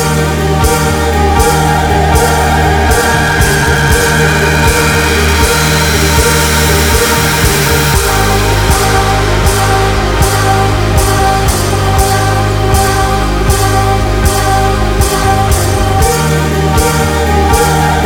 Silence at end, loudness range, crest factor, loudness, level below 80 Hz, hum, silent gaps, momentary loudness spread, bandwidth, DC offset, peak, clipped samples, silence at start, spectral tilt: 0 s; 2 LU; 10 dB; -9 LUFS; -16 dBFS; none; none; 3 LU; over 20 kHz; 0.6%; 0 dBFS; 0.5%; 0 s; -4 dB/octave